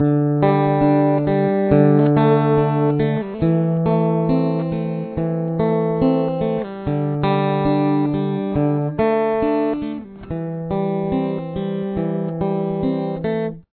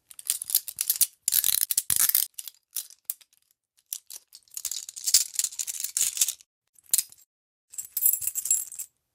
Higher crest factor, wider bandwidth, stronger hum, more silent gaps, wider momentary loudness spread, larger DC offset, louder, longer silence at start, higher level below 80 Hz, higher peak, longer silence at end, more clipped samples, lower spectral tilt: second, 18 dB vs 26 dB; second, 4.5 kHz vs 17 kHz; neither; second, none vs 6.46-6.62 s, 6.69-6.73 s, 7.26-7.68 s; second, 9 LU vs 18 LU; neither; first, -19 LUFS vs -25 LUFS; second, 0 s vs 0.25 s; first, -44 dBFS vs -72 dBFS; about the same, 0 dBFS vs -2 dBFS; second, 0.15 s vs 0.3 s; neither; first, -12.5 dB/octave vs 3.5 dB/octave